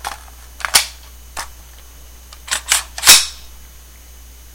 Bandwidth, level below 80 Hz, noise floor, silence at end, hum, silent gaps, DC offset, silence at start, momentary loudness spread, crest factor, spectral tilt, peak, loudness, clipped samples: 17 kHz; -40 dBFS; -40 dBFS; 1.05 s; none; none; under 0.1%; 0.05 s; 24 LU; 20 dB; 1.5 dB/octave; 0 dBFS; -12 LUFS; 0.3%